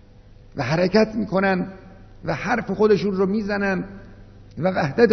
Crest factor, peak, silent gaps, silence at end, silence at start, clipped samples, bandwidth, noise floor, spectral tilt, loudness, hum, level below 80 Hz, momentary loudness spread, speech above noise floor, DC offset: 20 dB; -2 dBFS; none; 0 s; 0.55 s; under 0.1%; 6.4 kHz; -47 dBFS; -7 dB/octave; -21 LUFS; none; -46 dBFS; 15 LU; 26 dB; under 0.1%